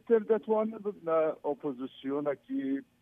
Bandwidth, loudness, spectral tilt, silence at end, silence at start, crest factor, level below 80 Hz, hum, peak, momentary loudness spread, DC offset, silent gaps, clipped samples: 3.7 kHz; -32 LUFS; -9 dB/octave; 0.2 s; 0.1 s; 18 dB; -80 dBFS; none; -14 dBFS; 9 LU; under 0.1%; none; under 0.1%